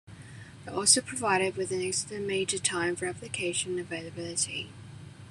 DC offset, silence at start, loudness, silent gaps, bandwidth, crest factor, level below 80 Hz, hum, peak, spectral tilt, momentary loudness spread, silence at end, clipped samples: under 0.1%; 0.05 s; -29 LUFS; none; 13 kHz; 24 dB; -64 dBFS; none; -6 dBFS; -2 dB/octave; 24 LU; 0 s; under 0.1%